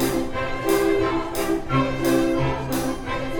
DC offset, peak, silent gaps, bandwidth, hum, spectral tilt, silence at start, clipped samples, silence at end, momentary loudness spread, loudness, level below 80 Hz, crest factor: under 0.1%; -8 dBFS; none; over 20 kHz; none; -5.5 dB/octave; 0 s; under 0.1%; 0 s; 6 LU; -23 LUFS; -36 dBFS; 14 dB